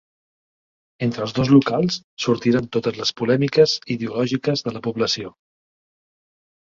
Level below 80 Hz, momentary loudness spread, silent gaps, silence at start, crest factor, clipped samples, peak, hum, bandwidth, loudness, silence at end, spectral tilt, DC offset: -56 dBFS; 10 LU; 2.04-2.17 s; 1 s; 18 dB; under 0.1%; -2 dBFS; none; 7.6 kHz; -20 LUFS; 1.45 s; -5.5 dB/octave; under 0.1%